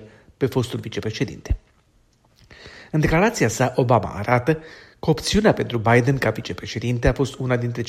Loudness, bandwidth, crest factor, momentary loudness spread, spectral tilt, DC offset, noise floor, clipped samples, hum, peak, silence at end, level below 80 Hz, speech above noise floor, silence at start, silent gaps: -21 LUFS; 15 kHz; 20 dB; 10 LU; -6 dB/octave; under 0.1%; -59 dBFS; under 0.1%; none; -2 dBFS; 0 s; -36 dBFS; 39 dB; 0 s; none